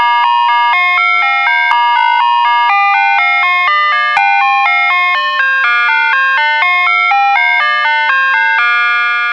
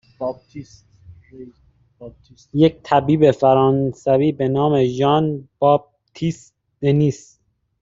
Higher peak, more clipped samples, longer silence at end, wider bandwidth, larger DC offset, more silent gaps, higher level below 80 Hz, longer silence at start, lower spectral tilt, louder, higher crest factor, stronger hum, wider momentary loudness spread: about the same, 0 dBFS vs -2 dBFS; neither; second, 0 s vs 0.65 s; about the same, 8 kHz vs 7.8 kHz; neither; neither; second, -66 dBFS vs -52 dBFS; second, 0 s vs 0.2 s; second, 1 dB/octave vs -8 dB/octave; first, -9 LUFS vs -18 LUFS; second, 10 dB vs 18 dB; first, 60 Hz at -70 dBFS vs none; second, 1 LU vs 14 LU